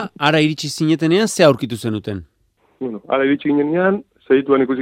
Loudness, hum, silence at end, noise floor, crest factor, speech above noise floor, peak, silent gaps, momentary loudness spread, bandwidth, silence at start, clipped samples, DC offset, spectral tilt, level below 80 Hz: -17 LUFS; none; 0 s; -60 dBFS; 18 dB; 44 dB; 0 dBFS; none; 14 LU; 16 kHz; 0 s; under 0.1%; under 0.1%; -5.5 dB/octave; -58 dBFS